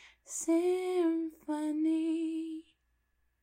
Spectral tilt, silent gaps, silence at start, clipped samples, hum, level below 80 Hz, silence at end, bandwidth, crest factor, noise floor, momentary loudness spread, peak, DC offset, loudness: -2.5 dB/octave; none; 0 s; under 0.1%; none; -76 dBFS; 0.8 s; 15.5 kHz; 12 dB; -76 dBFS; 11 LU; -22 dBFS; under 0.1%; -33 LUFS